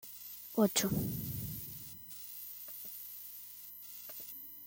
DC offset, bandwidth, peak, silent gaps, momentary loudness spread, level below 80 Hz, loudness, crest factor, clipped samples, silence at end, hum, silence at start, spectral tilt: under 0.1%; 17 kHz; -16 dBFS; none; 15 LU; -64 dBFS; -39 LUFS; 24 dB; under 0.1%; 0 s; 50 Hz at -65 dBFS; 0 s; -4.5 dB/octave